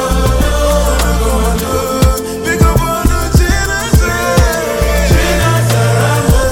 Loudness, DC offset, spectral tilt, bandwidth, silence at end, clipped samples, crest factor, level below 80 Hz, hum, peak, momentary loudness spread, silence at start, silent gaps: -12 LUFS; under 0.1%; -5 dB/octave; 17.5 kHz; 0 s; under 0.1%; 10 dB; -16 dBFS; none; 0 dBFS; 3 LU; 0 s; none